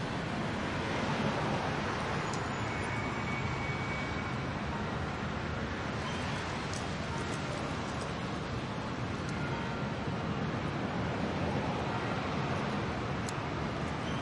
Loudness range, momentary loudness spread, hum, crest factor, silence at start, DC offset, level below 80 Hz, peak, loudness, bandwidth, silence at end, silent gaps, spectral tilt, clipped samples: 2 LU; 3 LU; none; 14 dB; 0 s; under 0.1%; -50 dBFS; -20 dBFS; -35 LUFS; 11.5 kHz; 0 s; none; -5.5 dB/octave; under 0.1%